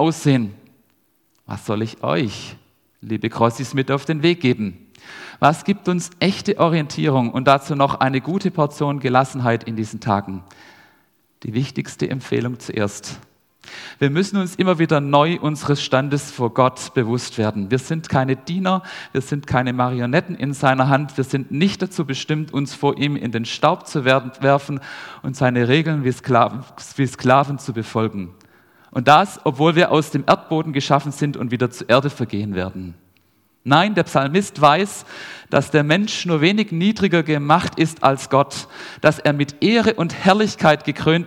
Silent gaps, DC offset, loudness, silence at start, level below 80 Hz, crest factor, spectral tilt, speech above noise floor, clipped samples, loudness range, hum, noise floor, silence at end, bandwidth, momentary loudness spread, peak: none; under 0.1%; -19 LUFS; 0 s; -56 dBFS; 20 dB; -6 dB/octave; 44 dB; under 0.1%; 5 LU; none; -63 dBFS; 0 s; 15 kHz; 11 LU; 0 dBFS